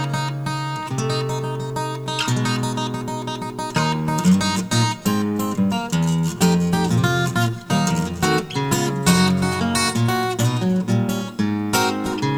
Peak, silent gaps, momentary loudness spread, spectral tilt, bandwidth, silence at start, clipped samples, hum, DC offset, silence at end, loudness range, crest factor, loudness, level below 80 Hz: -2 dBFS; none; 8 LU; -5 dB/octave; 17.5 kHz; 0 s; under 0.1%; none; under 0.1%; 0 s; 4 LU; 18 dB; -21 LUFS; -48 dBFS